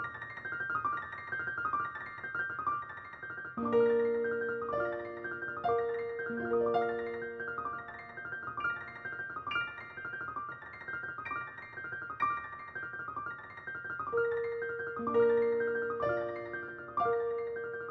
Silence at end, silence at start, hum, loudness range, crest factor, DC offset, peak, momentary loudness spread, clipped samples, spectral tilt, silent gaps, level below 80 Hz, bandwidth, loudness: 0 s; 0 s; none; 6 LU; 18 dB; under 0.1%; -18 dBFS; 11 LU; under 0.1%; -7.5 dB/octave; none; -68 dBFS; 5.8 kHz; -35 LUFS